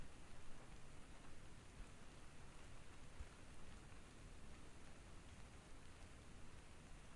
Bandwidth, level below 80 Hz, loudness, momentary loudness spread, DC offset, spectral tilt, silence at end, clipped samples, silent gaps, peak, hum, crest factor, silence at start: 11.5 kHz; -62 dBFS; -62 LUFS; 2 LU; under 0.1%; -4.5 dB/octave; 0 s; under 0.1%; none; -40 dBFS; none; 14 dB; 0 s